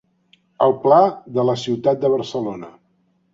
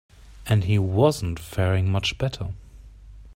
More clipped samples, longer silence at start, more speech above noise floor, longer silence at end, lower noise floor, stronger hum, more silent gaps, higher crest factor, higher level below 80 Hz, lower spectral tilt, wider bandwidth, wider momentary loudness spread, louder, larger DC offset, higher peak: neither; first, 0.6 s vs 0.3 s; first, 46 dB vs 22 dB; first, 0.65 s vs 0.05 s; first, -63 dBFS vs -44 dBFS; neither; neither; about the same, 18 dB vs 18 dB; second, -62 dBFS vs -44 dBFS; about the same, -7 dB/octave vs -6 dB/octave; second, 7.8 kHz vs 16 kHz; about the same, 12 LU vs 14 LU; first, -18 LUFS vs -23 LUFS; neither; first, -2 dBFS vs -6 dBFS